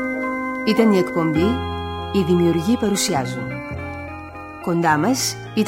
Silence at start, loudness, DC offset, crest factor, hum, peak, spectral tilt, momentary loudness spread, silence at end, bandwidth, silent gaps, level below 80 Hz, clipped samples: 0 s; -20 LUFS; under 0.1%; 16 dB; none; -4 dBFS; -5 dB/octave; 13 LU; 0 s; 17 kHz; none; -44 dBFS; under 0.1%